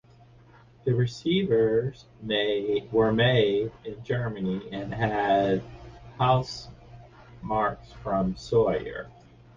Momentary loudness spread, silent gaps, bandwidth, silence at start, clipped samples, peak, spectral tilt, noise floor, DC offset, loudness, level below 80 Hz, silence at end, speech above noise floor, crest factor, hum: 17 LU; none; 7.4 kHz; 0.85 s; under 0.1%; -8 dBFS; -7 dB/octave; -54 dBFS; under 0.1%; -26 LUFS; -50 dBFS; 0.45 s; 28 dB; 18 dB; none